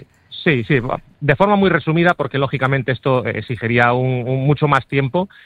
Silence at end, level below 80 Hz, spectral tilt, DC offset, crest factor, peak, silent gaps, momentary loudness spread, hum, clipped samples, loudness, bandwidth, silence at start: 0.2 s; -46 dBFS; -8.5 dB/octave; under 0.1%; 16 dB; 0 dBFS; none; 6 LU; none; under 0.1%; -17 LUFS; 7.8 kHz; 0.3 s